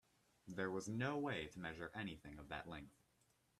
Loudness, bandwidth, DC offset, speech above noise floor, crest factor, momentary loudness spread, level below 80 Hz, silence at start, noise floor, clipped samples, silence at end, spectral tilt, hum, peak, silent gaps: -47 LUFS; 13.5 kHz; under 0.1%; 33 dB; 18 dB; 13 LU; -70 dBFS; 0.45 s; -79 dBFS; under 0.1%; 0.7 s; -5.5 dB/octave; none; -30 dBFS; none